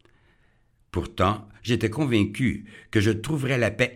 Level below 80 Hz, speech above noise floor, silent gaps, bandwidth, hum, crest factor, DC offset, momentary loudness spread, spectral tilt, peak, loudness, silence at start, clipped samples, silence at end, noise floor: -48 dBFS; 38 dB; none; 15.5 kHz; none; 20 dB; under 0.1%; 10 LU; -6 dB/octave; -6 dBFS; -25 LUFS; 0.95 s; under 0.1%; 0 s; -63 dBFS